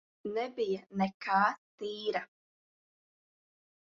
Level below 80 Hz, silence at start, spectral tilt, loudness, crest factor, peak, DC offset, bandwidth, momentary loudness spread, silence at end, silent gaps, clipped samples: -78 dBFS; 0.25 s; -3.5 dB/octave; -34 LUFS; 22 dB; -14 dBFS; under 0.1%; 7.4 kHz; 12 LU; 1.55 s; 1.14-1.20 s, 1.58-1.78 s; under 0.1%